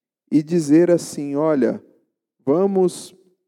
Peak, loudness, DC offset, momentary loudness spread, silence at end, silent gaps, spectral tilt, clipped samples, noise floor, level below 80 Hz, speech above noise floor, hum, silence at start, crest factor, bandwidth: -4 dBFS; -19 LUFS; under 0.1%; 12 LU; 0.4 s; none; -7 dB/octave; under 0.1%; -66 dBFS; -76 dBFS; 49 dB; none; 0.3 s; 14 dB; 13.5 kHz